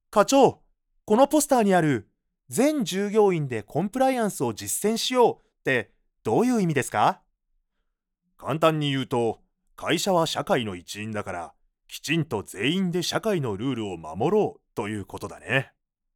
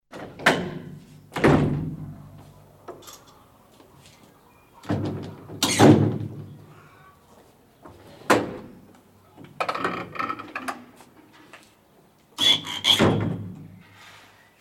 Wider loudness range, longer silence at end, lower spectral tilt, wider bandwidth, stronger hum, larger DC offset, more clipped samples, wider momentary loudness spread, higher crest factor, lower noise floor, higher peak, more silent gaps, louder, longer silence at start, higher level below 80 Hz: second, 5 LU vs 9 LU; about the same, 0.5 s vs 0.5 s; about the same, -4.5 dB/octave vs -4.5 dB/octave; first, 19.5 kHz vs 17.5 kHz; neither; neither; neither; second, 14 LU vs 25 LU; about the same, 20 dB vs 24 dB; first, -77 dBFS vs -57 dBFS; about the same, -4 dBFS vs -2 dBFS; neither; about the same, -24 LUFS vs -22 LUFS; about the same, 0.1 s vs 0.15 s; second, -62 dBFS vs -52 dBFS